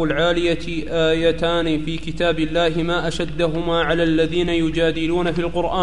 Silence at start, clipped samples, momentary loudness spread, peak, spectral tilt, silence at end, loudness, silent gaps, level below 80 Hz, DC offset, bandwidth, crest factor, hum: 0 s; under 0.1%; 4 LU; -6 dBFS; -6 dB/octave; 0 s; -20 LUFS; none; -36 dBFS; 3%; 10.5 kHz; 14 dB; none